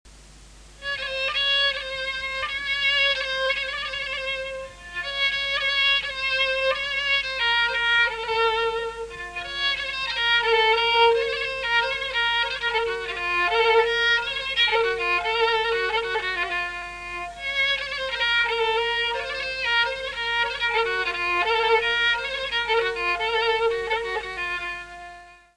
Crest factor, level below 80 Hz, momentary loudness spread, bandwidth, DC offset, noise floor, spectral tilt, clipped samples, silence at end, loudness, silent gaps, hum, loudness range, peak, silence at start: 18 dB; -50 dBFS; 10 LU; 11 kHz; under 0.1%; -47 dBFS; -1.5 dB/octave; under 0.1%; 0.2 s; -22 LUFS; none; none; 3 LU; -6 dBFS; 0.05 s